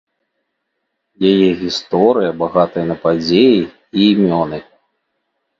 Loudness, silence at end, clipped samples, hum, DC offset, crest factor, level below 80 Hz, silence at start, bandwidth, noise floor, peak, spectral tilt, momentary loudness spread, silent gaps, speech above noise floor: -14 LUFS; 1 s; under 0.1%; none; under 0.1%; 16 dB; -50 dBFS; 1.2 s; 7.6 kHz; -72 dBFS; 0 dBFS; -6.5 dB/octave; 8 LU; none; 59 dB